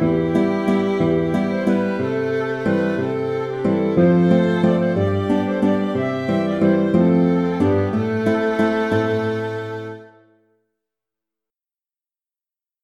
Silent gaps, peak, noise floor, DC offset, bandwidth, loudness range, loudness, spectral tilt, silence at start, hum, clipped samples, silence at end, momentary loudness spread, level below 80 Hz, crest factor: none; -2 dBFS; under -90 dBFS; under 0.1%; 8.6 kHz; 7 LU; -19 LUFS; -8.5 dB/octave; 0 s; none; under 0.1%; 2.8 s; 6 LU; -52 dBFS; 18 dB